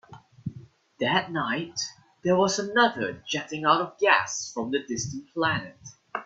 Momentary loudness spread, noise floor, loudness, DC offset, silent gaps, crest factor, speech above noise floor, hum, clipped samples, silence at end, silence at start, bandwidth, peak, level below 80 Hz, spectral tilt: 14 LU; -48 dBFS; -26 LUFS; under 0.1%; none; 22 dB; 22 dB; none; under 0.1%; 0 s; 0.1 s; 8.4 kHz; -4 dBFS; -66 dBFS; -3.5 dB/octave